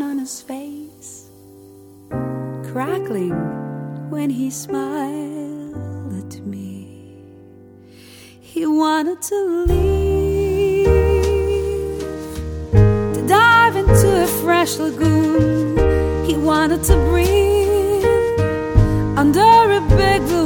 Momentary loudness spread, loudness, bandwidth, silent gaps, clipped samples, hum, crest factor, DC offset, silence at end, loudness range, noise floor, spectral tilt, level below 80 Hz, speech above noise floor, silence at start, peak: 17 LU; -17 LUFS; 19.5 kHz; none; under 0.1%; none; 18 dB; under 0.1%; 0 s; 12 LU; -43 dBFS; -6 dB/octave; -26 dBFS; 26 dB; 0 s; 0 dBFS